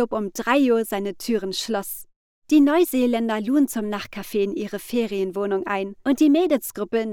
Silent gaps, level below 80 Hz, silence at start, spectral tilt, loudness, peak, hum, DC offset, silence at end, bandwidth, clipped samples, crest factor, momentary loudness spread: 2.16-2.42 s; -58 dBFS; 0 s; -4.5 dB/octave; -22 LUFS; -6 dBFS; none; under 0.1%; 0 s; 18 kHz; under 0.1%; 16 dB; 10 LU